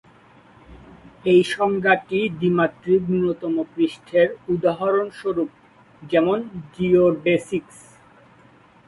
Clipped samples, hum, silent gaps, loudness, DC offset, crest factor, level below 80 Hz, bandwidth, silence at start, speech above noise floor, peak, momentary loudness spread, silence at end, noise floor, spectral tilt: under 0.1%; none; none; -21 LUFS; under 0.1%; 18 dB; -56 dBFS; 11.5 kHz; 0.7 s; 32 dB; -4 dBFS; 9 LU; 1.25 s; -52 dBFS; -7 dB/octave